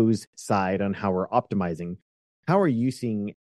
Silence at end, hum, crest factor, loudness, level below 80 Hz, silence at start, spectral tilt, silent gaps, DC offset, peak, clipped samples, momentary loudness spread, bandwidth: 0.2 s; none; 18 dB; -26 LUFS; -62 dBFS; 0 s; -7 dB/octave; 0.27-0.33 s, 2.02-2.43 s; under 0.1%; -8 dBFS; under 0.1%; 12 LU; 12.5 kHz